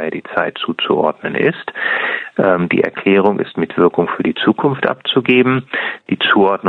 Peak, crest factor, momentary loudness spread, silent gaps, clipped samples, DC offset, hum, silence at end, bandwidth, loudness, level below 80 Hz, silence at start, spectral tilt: 0 dBFS; 16 dB; 7 LU; none; under 0.1%; under 0.1%; none; 0 s; 4.4 kHz; -15 LUFS; -58 dBFS; 0 s; -8 dB/octave